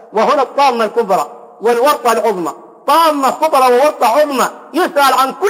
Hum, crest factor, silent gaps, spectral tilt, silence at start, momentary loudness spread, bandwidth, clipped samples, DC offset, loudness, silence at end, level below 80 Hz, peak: none; 12 dB; none; -3 dB/octave; 0.1 s; 7 LU; 16.5 kHz; under 0.1%; under 0.1%; -13 LUFS; 0 s; -68 dBFS; -2 dBFS